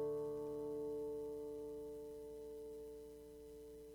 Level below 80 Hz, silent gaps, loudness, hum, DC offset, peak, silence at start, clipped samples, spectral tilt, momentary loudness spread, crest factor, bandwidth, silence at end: -68 dBFS; none; -48 LUFS; 60 Hz at -70 dBFS; under 0.1%; -34 dBFS; 0 s; under 0.1%; -7 dB/octave; 12 LU; 12 dB; 19.5 kHz; 0 s